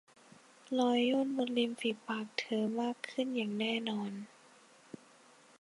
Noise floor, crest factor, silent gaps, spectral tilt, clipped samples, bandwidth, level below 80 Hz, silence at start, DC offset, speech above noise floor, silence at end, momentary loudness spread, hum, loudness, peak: -62 dBFS; 20 dB; none; -5 dB/octave; under 0.1%; 11.5 kHz; -88 dBFS; 0.65 s; under 0.1%; 28 dB; 1.35 s; 21 LU; none; -35 LUFS; -16 dBFS